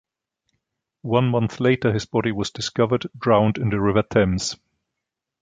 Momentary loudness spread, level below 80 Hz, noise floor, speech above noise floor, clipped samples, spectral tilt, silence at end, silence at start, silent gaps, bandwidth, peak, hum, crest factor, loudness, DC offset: 7 LU; -46 dBFS; -84 dBFS; 63 dB; under 0.1%; -6 dB/octave; 0.85 s; 1.05 s; none; 9.4 kHz; -4 dBFS; none; 20 dB; -21 LUFS; under 0.1%